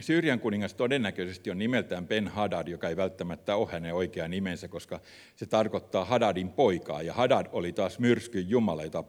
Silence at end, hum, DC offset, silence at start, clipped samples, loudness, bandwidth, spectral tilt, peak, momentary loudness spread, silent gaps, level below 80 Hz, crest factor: 0.05 s; none; under 0.1%; 0 s; under 0.1%; -30 LUFS; 16 kHz; -6 dB/octave; -10 dBFS; 9 LU; none; -62 dBFS; 20 dB